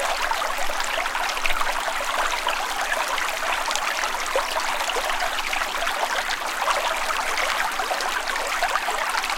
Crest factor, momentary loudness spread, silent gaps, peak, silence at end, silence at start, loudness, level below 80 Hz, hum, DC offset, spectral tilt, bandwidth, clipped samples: 24 dB; 2 LU; none; 0 dBFS; 0 s; 0 s; -23 LUFS; -40 dBFS; none; under 0.1%; 0.5 dB/octave; 17 kHz; under 0.1%